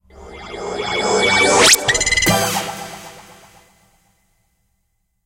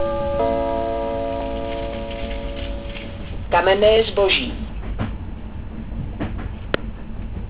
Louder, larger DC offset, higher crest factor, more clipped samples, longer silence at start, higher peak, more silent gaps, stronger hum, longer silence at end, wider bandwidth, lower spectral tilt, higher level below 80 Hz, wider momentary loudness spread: first, -14 LUFS vs -22 LUFS; second, under 0.1% vs 0.9%; about the same, 20 dB vs 18 dB; neither; first, 0.15 s vs 0 s; first, 0 dBFS vs -4 dBFS; neither; neither; first, 2.05 s vs 0 s; first, 16.5 kHz vs 4 kHz; second, -1.5 dB/octave vs -9.5 dB/octave; second, -42 dBFS vs -32 dBFS; first, 23 LU vs 17 LU